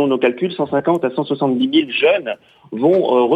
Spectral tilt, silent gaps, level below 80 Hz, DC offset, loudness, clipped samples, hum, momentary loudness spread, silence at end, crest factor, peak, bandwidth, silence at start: -7.5 dB/octave; none; -66 dBFS; under 0.1%; -17 LUFS; under 0.1%; none; 8 LU; 0 s; 14 dB; -4 dBFS; 8 kHz; 0 s